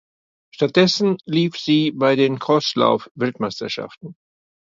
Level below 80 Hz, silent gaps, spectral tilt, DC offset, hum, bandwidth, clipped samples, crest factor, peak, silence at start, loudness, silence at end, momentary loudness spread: -64 dBFS; 3.11-3.15 s; -5.5 dB/octave; under 0.1%; none; 7.6 kHz; under 0.1%; 20 dB; 0 dBFS; 0.6 s; -19 LUFS; 0.65 s; 11 LU